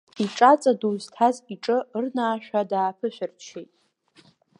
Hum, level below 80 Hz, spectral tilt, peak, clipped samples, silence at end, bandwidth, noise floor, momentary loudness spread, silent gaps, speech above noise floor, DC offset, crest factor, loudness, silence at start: none; -80 dBFS; -5 dB/octave; -4 dBFS; under 0.1%; 0.95 s; 11 kHz; -59 dBFS; 17 LU; none; 35 dB; under 0.1%; 22 dB; -23 LUFS; 0.15 s